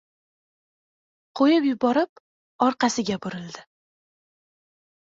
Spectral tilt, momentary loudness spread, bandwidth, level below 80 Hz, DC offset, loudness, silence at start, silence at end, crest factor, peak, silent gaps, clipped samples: -4.5 dB/octave; 19 LU; 7.8 kHz; -68 dBFS; under 0.1%; -23 LUFS; 1.35 s; 1.45 s; 20 dB; -6 dBFS; 2.09-2.59 s; under 0.1%